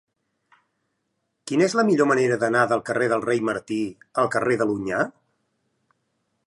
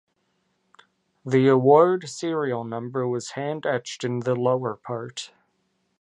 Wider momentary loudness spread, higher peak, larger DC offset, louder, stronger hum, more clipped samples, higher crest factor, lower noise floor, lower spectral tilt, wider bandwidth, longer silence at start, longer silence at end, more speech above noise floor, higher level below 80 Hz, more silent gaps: second, 9 LU vs 16 LU; about the same, -6 dBFS vs -4 dBFS; neither; about the same, -22 LUFS vs -23 LUFS; neither; neither; about the same, 18 dB vs 20 dB; first, -76 dBFS vs -71 dBFS; about the same, -5.5 dB/octave vs -6 dB/octave; about the same, 11.5 kHz vs 11 kHz; first, 1.45 s vs 1.25 s; first, 1.35 s vs 0.75 s; first, 54 dB vs 49 dB; first, -66 dBFS vs -72 dBFS; neither